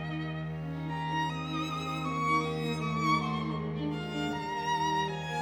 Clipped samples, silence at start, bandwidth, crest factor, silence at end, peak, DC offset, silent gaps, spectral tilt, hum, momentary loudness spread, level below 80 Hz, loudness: under 0.1%; 0 s; 13.5 kHz; 16 dB; 0 s; -16 dBFS; under 0.1%; none; -5.5 dB/octave; none; 7 LU; -56 dBFS; -32 LUFS